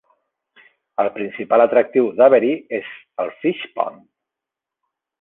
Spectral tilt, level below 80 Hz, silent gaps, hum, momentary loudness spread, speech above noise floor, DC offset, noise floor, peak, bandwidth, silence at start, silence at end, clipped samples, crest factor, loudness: -8.5 dB/octave; -72 dBFS; none; none; 14 LU; 68 dB; under 0.1%; -86 dBFS; -2 dBFS; 4 kHz; 1 s; 1.3 s; under 0.1%; 18 dB; -18 LUFS